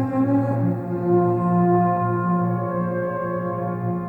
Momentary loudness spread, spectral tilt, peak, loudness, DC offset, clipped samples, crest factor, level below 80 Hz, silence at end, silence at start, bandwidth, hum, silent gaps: 7 LU; -12 dB/octave; -8 dBFS; -22 LUFS; under 0.1%; under 0.1%; 12 dB; -58 dBFS; 0 s; 0 s; 2.8 kHz; none; none